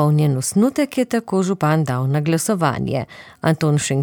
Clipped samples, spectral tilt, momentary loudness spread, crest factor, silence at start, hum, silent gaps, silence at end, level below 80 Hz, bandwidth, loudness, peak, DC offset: under 0.1%; -6 dB/octave; 6 LU; 16 dB; 0 s; none; none; 0 s; -54 dBFS; 18.5 kHz; -19 LUFS; -2 dBFS; under 0.1%